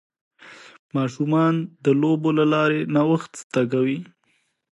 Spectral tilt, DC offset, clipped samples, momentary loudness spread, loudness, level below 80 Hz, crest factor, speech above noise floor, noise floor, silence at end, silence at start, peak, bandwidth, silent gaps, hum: -7 dB/octave; under 0.1%; under 0.1%; 7 LU; -21 LUFS; -70 dBFS; 16 dB; 47 dB; -68 dBFS; 0.7 s; 0.45 s; -6 dBFS; 11.5 kHz; 0.79-0.89 s, 3.44-3.50 s; none